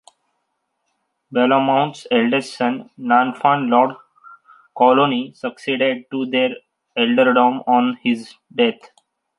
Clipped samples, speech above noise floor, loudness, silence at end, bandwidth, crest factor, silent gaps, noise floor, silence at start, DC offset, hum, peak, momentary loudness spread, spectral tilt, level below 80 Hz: under 0.1%; 55 dB; -18 LUFS; 0.65 s; 11.5 kHz; 18 dB; none; -73 dBFS; 1.3 s; under 0.1%; none; -2 dBFS; 10 LU; -5.5 dB/octave; -72 dBFS